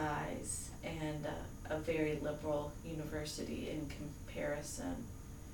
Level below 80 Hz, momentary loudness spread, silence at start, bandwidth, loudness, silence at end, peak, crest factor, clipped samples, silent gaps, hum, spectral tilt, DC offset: -54 dBFS; 9 LU; 0 s; 19 kHz; -42 LUFS; 0 s; -24 dBFS; 16 dB; under 0.1%; none; none; -5 dB/octave; under 0.1%